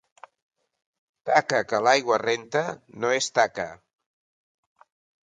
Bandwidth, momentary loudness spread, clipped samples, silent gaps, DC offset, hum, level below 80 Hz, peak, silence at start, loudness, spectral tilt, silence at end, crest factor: 9.6 kHz; 13 LU; under 0.1%; none; under 0.1%; none; -70 dBFS; -2 dBFS; 1.25 s; -24 LUFS; -3 dB/octave; 1.5 s; 24 dB